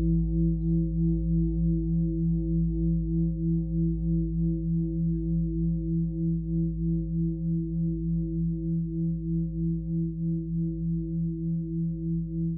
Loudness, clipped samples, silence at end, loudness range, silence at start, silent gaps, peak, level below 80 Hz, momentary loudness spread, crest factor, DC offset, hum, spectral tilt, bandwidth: -28 LUFS; under 0.1%; 0 s; 3 LU; 0 s; none; -16 dBFS; -34 dBFS; 4 LU; 10 dB; under 0.1%; none; -19 dB/octave; 0.8 kHz